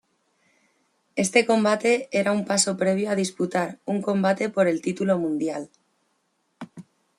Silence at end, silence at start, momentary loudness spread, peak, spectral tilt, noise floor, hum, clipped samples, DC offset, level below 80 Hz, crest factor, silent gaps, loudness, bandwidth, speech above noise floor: 0.35 s; 1.15 s; 14 LU; -4 dBFS; -4.5 dB/octave; -71 dBFS; none; under 0.1%; under 0.1%; -70 dBFS; 20 dB; none; -23 LUFS; 13 kHz; 48 dB